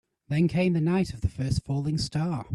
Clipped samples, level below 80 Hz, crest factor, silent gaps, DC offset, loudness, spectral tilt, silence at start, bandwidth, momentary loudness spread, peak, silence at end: under 0.1%; -44 dBFS; 14 dB; none; under 0.1%; -27 LUFS; -7 dB/octave; 0.3 s; 12 kHz; 6 LU; -14 dBFS; 0 s